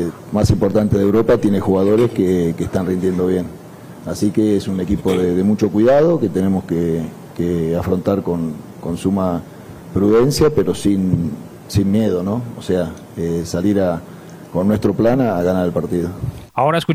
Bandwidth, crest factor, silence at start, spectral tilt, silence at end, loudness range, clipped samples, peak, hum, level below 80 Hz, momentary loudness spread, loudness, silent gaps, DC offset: 16 kHz; 14 dB; 0 s; -7.5 dB/octave; 0 s; 3 LU; under 0.1%; -2 dBFS; none; -40 dBFS; 12 LU; -17 LUFS; none; under 0.1%